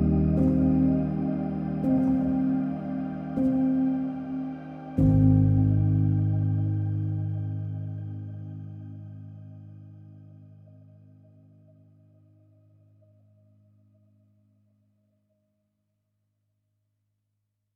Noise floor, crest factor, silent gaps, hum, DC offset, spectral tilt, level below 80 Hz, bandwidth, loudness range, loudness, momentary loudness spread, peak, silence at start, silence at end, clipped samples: -79 dBFS; 18 dB; none; none; under 0.1%; -12 dB/octave; -44 dBFS; 3.3 kHz; 19 LU; -26 LUFS; 20 LU; -10 dBFS; 0 s; 7.3 s; under 0.1%